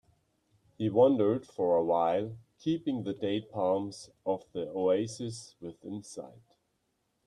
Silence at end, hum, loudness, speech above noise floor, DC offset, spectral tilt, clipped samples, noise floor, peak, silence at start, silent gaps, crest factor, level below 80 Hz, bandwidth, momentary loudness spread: 0.95 s; none; -30 LUFS; 47 dB; under 0.1%; -6.5 dB/octave; under 0.1%; -78 dBFS; -12 dBFS; 0.8 s; none; 20 dB; -72 dBFS; 11 kHz; 18 LU